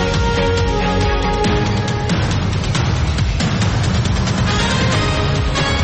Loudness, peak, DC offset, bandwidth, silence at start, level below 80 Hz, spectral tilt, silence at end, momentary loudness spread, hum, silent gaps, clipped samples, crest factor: -17 LUFS; -6 dBFS; under 0.1%; 8.8 kHz; 0 s; -24 dBFS; -5.5 dB/octave; 0 s; 2 LU; none; none; under 0.1%; 10 dB